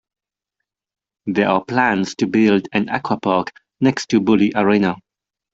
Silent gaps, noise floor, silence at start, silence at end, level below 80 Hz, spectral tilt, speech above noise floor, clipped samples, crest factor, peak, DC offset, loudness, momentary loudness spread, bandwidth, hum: none; -86 dBFS; 1.25 s; 0.6 s; -58 dBFS; -6 dB/octave; 69 dB; under 0.1%; 16 dB; -2 dBFS; under 0.1%; -18 LUFS; 7 LU; 7.8 kHz; none